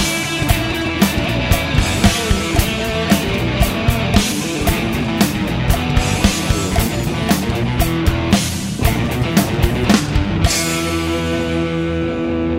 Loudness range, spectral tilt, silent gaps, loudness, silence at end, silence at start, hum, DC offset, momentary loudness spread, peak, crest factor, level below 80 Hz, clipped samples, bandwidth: 1 LU; -4.5 dB/octave; none; -17 LUFS; 0 s; 0 s; none; under 0.1%; 4 LU; 0 dBFS; 16 dB; -24 dBFS; under 0.1%; 16.5 kHz